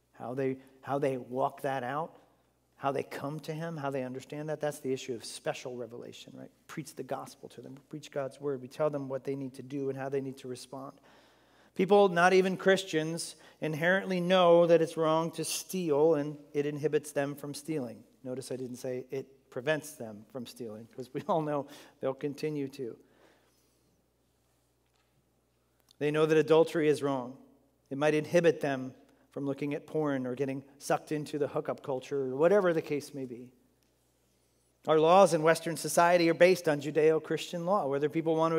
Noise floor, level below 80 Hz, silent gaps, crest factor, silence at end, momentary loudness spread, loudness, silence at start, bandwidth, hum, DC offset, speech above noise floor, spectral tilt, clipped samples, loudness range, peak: -72 dBFS; -80 dBFS; none; 22 dB; 0 s; 19 LU; -30 LUFS; 0.2 s; 16 kHz; none; under 0.1%; 42 dB; -5 dB/octave; under 0.1%; 12 LU; -10 dBFS